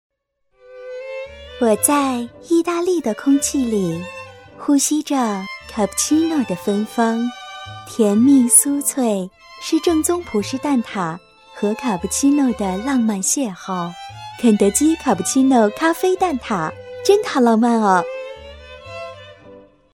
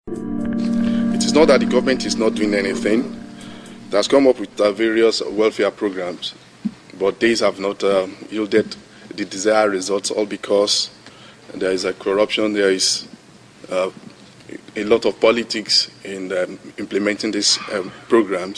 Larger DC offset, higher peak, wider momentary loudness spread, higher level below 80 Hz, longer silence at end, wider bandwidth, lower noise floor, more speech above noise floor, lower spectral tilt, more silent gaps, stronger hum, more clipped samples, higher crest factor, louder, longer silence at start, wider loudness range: neither; about the same, 0 dBFS vs -2 dBFS; first, 18 LU vs 14 LU; about the same, -50 dBFS vs -52 dBFS; first, 0.35 s vs 0 s; first, 16.5 kHz vs 13 kHz; first, -65 dBFS vs -45 dBFS; first, 48 dB vs 27 dB; about the same, -4 dB/octave vs -3.5 dB/octave; neither; neither; neither; about the same, 18 dB vs 18 dB; about the same, -18 LUFS vs -19 LUFS; first, 0.7 s vs 0.05 s; about the same, 4 LU vs 3 LU